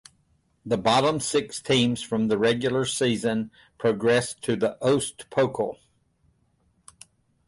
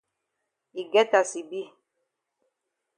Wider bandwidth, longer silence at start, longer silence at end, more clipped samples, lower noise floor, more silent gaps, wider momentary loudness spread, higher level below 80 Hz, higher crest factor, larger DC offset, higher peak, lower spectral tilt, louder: about the same, 11.5 kHz vs 11 kHz; about the same, 0.65 s vs 0.75 s; first, 1.75 s vs 1.3 s; neither; second, -67 dBFS vs -82 dBFS; neither; second, 7 LU vs 20 LU; first, -60 dBFS vs -88 dBFS; second, 16 dB vs 22 dB; neither; about the same, -8 dBFS vs -6 dBFS; first, -4.5 dB/octave vs -2 dB/octave; about the same, -24 LUFS vs -24 LUFS